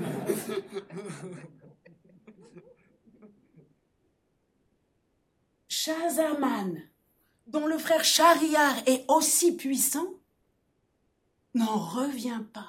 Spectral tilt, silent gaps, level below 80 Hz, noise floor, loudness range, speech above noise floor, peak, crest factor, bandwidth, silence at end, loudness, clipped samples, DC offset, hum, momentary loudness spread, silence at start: -2.5 dB/octave; none; -78 dBFS; -73 dBFS; 16 LU; 47 dB; -8 dBFS; 22 dB; 17 kHz; 0 s; -26 LUFS; under 0.1%; under 0.1%; none; 19 LU; 0 s